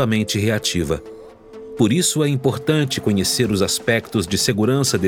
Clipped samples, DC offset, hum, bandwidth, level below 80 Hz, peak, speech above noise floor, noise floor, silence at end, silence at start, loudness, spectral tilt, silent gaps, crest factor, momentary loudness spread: under 0.1%; under 0.1%; none; 18.5 kHz; -46 dBFS; -4 dBFS; 20 dB; -39 dBFS; 0 s; 0 s; -19 LUFS; -4.5 dB/octave; none; 14 dB; 7 LU